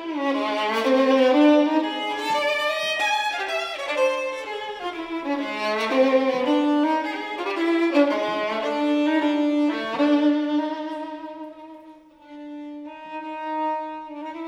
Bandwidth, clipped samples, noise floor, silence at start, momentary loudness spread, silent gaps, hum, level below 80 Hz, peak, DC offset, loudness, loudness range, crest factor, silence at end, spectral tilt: 12.5 kHz; under 0.1%; -47 dBFS; 0 s; 16 LU; none; none; -68 dBFS; -6 dBFS; under 0.1%; -22 LUFS; 9 LU; 16 dB; 0 s; -3.5 dB/octave